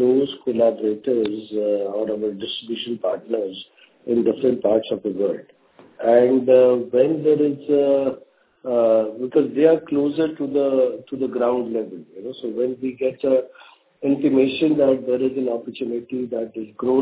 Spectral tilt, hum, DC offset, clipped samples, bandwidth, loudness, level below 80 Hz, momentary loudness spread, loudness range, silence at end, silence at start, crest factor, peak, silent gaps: -10.5 dB/octave; none; under 0.1%; under 0.1%; 4 kHz; -21 LUFS; -64 dBFS; 11 LU; 5 LU; 0 s; 0 s; 18 dB; -2 dBFS; none